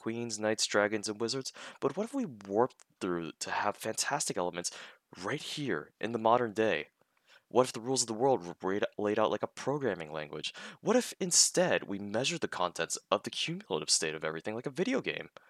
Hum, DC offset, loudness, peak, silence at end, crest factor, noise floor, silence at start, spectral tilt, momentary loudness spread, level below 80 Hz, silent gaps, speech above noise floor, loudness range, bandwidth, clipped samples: none; under 0.1%; -32 LUFS; -10 dBFS; 0.2 s; 24 dB; -65 dBFS; 0 s; -3 dB/octave; 10 LU; -78 dBFS; none; 33 dB; 4 LU; 15 kHz; under 0.1%